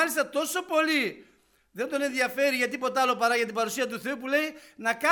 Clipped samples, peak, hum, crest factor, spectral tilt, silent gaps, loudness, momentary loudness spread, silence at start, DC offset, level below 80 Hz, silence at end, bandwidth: under 0.1%; -8 dBFS; none; 20 dB; -2 dB/octave; none; -27 LUFS; 8 LU; 0 s; under 0.1%; -74 dBFS; 0 s; over 20 kHz